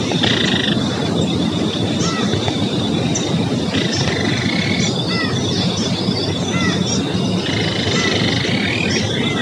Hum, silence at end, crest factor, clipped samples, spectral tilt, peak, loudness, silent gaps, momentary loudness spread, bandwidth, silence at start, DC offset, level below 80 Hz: none; 0 s; 16 dB; under 0.1%; -4.5 dB/octave; -2 dBFS; -17 LUFS; none; 3 LU; 11.5 kHz; 0 s; under 0.1%; -46 dBFS